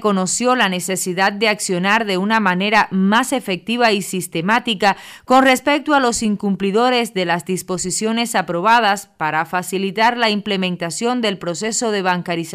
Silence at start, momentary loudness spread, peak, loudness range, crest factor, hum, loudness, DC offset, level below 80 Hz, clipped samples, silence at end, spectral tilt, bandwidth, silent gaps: 0 s; 7 LU; -4 dBFS; 2 LU; 14 dB; none; -17 LUFS; under 0.1%; -56 dBFS; under 0.1%; 0 s; -3.5 dB/octave; 15.5 kHz; none